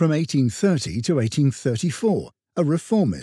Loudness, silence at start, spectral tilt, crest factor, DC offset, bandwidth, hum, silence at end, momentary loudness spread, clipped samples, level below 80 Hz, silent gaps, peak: -22 LUFS; 0 s; -6.5 dB/octave; 14 dB; under 0.1%; 12.5 kHz; none; 0 s; 4 LU; under 0.1%; -52 dBFS; none; -6 dBFS